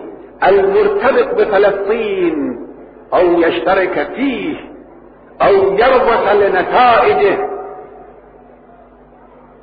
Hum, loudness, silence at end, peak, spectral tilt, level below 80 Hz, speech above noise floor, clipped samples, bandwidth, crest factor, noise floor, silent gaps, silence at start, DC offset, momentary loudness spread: none; -13 LUFS; 1.6 s; 0 dBFS; -3 dB/octave; -44 dBFS; 30 dB; under 0.1%; 5 kHz; 14 dB; -42 dBFS; none; 0 s; under 0.1%; 13 LU